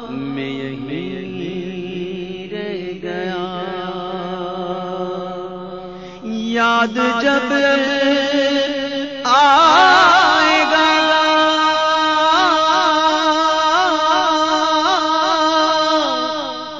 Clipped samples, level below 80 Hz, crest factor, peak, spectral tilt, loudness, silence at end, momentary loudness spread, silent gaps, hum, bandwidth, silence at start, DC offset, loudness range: under 0.1%; -54 dBFS; 14 dB; -2 dBFS; -3.5 dB/octave; -15 LUFS; 0 s; 15 LU; none; none; 7.8 kHz; 0 s; 0.3%; 13 LU